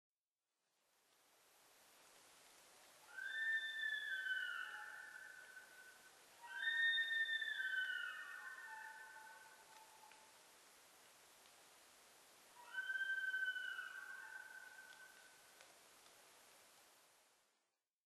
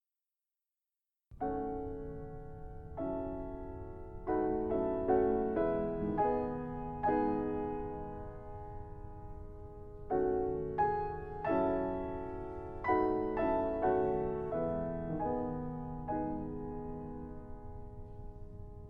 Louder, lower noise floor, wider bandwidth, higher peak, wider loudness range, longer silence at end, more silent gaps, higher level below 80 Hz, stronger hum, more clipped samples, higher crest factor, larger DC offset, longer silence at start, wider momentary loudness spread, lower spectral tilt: second, -44 LUFS vs -36 LUFS; about the same, under -90 dBFS vs under -90 dBFS; first, 13 kHz vs 5 kHz; second, -30 dBFS vs -18 dBFS; first, 19 LU vs 8 LU; first, 1.05 s vs 0 s; neither; second, under -90 dBFS vs -50 dBFS; neither; neither; about the same, 20 dB vs 20 dB; neither; first, 1.65 s vs 1.3 s; first, 24 LU vs 18 LU; second, 2 dB/octave vs -10.5 dB/octave